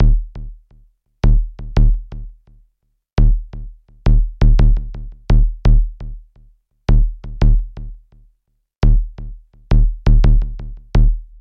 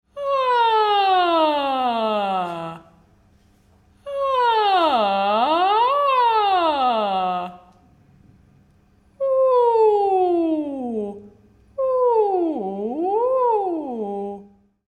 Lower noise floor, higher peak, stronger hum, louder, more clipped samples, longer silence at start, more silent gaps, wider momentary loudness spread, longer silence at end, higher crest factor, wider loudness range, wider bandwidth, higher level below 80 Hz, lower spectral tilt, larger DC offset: first, -66 dBFS vs -56 dBFS; first, -2 dBFS vs -6 dBFS; neither; about the same, -19 LUFS vs -20 LUFS; neither; second, 0 s vs 0.15 s; neither; first, 20 LU vs 11 LU; second, 0.15 s vs 0.45 s; about the same, 12 dB vs 14 dB; about the same, 3 LU vs 5 LU; second, 5.6 kHz vs 12.5 kHz; first, -16 dBFS vs -60 dBFS; first, -8.5 dB/octave vs -6 dB/octave; neither